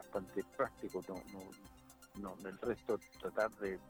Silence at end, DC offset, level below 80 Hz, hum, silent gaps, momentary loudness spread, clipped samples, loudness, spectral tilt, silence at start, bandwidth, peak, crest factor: 0 s; under 0.1%; -66 dBFS; none; none; 17 LU; under 0.1%; -43 LUFS; -5.5 dB/octave; 0 s; over 20 kHz; -22 dBFS; 22 dB